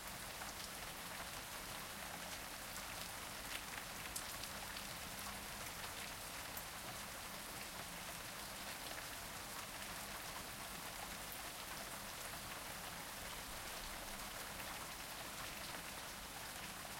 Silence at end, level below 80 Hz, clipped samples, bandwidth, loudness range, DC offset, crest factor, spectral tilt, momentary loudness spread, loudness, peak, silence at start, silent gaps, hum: 0 s; -64 dBFS; under 0.1%; 16.5 kHz; 1 LU; under 0.1%; 22 dB; -1.5 dB/octave; 1 LU; -47 LUFS; -28 dBFS; 0 s; none; none